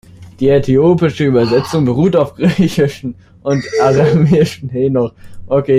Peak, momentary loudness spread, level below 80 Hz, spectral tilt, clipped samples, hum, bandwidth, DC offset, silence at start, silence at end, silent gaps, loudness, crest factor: -2 dBFS; 7 LU; -40 dBFS; -7.5 dB/octave; under 0.1%; none; 14.5 kHz; under 0.1%; 0.2 s; 0 s; none; -13 LUFS; 12 dB